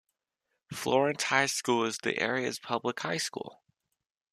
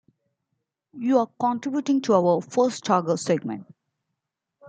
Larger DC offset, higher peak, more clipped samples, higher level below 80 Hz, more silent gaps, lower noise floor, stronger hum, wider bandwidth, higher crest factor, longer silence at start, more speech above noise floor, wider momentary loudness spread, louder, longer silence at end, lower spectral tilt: neither; about the same, -8 dBFS vs -6 dBFS; neither; about the same, -74 dBFS vs -74 dBFS; neither; about the same, -83 dBFS vs -83 dBFS; neither; first, 14 kHz vs 9.4 kHz; about the same, 24 dB vs 20 dB; second, 0.7 s vs 0.95 s; second, 53 dB vs 60 dB; first, 10 LU vs 7 LU; second, -30 LUFS vs -23 LUFS; first, 0.8 s vs 0 s; second, -3 dB/octave vs -6 dB/octave